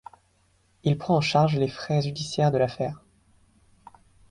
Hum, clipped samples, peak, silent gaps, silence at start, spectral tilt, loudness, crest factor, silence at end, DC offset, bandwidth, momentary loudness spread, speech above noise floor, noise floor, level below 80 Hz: none; under 0.1%; -8 dBFS; none; 0.85 s; -6.5 dB/octave; -25 LUFS; 18 dB; 1.35 s; under 0.1%; 11 kHz; 10 LU; 41 dB; -65 dBFS; -58 dBFS